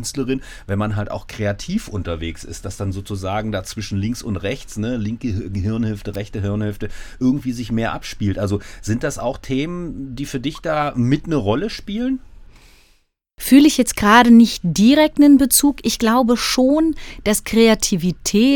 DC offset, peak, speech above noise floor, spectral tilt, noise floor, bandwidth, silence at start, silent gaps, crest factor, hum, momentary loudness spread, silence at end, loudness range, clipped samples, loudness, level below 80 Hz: under 0.1%; 0 dBFS; 42 dB; -5 dB/octave; -59 dBFS; 19 kHz; 0 s; none; 18 dB; none; 15 LU; 0 s; 12 LU; under 0.1%; -18 LUFS; -38 dBFS